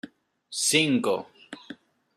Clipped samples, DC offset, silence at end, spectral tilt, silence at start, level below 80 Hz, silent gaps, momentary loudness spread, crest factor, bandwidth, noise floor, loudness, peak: under 0.1%; under 0.1%; 0.45 s; -2.5 dB/octave; 0.05 s; -74 dBFS; none; 23 LU; 22 dB; 15.5 kHz; -48 dBFS; -24 LUFS; -6 dBFS